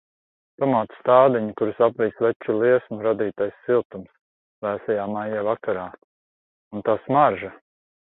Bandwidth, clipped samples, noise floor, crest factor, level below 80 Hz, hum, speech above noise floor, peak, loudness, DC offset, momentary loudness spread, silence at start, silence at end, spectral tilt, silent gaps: 4.1 kHz; under 0.1%; under -90 dBFS; 20 dB; -64 dBFS; none; over 68 dB; -2 dBFS; -22 LUFS; under 0.1%; 13 LU; 0.6 s; 0.65 s; -11 dB/octave; 2.36-2.40 s, 3.85-3.90 s, 4.21-4.62 s, 6.04-6.71 s